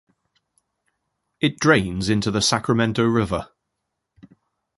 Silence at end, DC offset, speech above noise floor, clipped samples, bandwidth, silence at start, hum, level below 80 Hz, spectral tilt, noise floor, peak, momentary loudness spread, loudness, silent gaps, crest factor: 1.3 s; under 0.1%; 59 dB; under 0.1%; 11.5 kHz; 1.4 s; none; -46 dBFS; -4.5 dB/octave; -79 dBFS; -2 dBFS; 7 LU; -20 LUFS; none; 20 dB